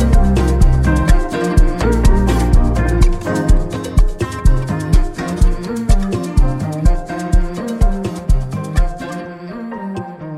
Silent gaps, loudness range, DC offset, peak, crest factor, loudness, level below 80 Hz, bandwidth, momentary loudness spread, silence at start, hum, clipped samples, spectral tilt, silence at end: none; 5 LU; under 0.1%; 0 dBFS; 12 dB; -17 LUFS; -14 dBFS; 12.5 kHz; 11 LU; 0 s; none; under 0.1%; -7 dB/octave; 0 s